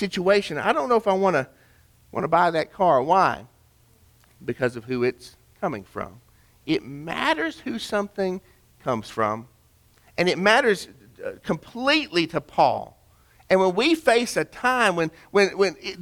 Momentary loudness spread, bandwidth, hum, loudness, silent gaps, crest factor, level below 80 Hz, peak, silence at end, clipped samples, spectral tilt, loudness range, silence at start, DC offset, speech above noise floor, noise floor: 16 LU; 18.5 kHz; none; -23 LUFS; none; 20 dB; -58 dBFS; -4 dBFS; 0 s; under 0.1%; -4.5 dB/octave; 6 LU; 0 s; under 0.1%; 36 dB; -58 dBFS